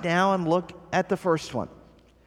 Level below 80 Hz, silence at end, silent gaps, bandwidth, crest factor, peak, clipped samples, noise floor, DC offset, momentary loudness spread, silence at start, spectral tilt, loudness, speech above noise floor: -58 dBFS; 0.55 s; none; 14.5 kHz; 18 dB; -8 dBFS; under 0.1%; -54 dBFS; under 0.1%; 11 LU; 0 s; -6 dB/octave; -26 LUFS; 29 dB